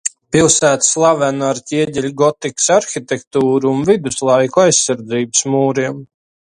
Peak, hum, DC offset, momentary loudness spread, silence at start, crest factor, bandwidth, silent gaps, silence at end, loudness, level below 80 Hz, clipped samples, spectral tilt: 0 dBFS; none; under 0.1%; 8 LU; 0.05 s; 14 dB; 11.5 kHz; 3.27-3.31 s; 0.45 s; -14 LUFS; -50 dBFS; under 0.1%; -3.5 dB/octave